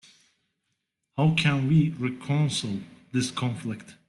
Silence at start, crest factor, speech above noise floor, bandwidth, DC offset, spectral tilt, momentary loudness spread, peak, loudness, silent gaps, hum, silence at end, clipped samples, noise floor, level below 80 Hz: 1.15 s; 18 dB; 54 dB; 11.5 kHz; under 0.1%; -5.5 dB/octave; 13 LU; -10 dBFS; -26 LUFS; none; none; 0.15 s; under 0.1%; -79 dBFS; -60 dBFS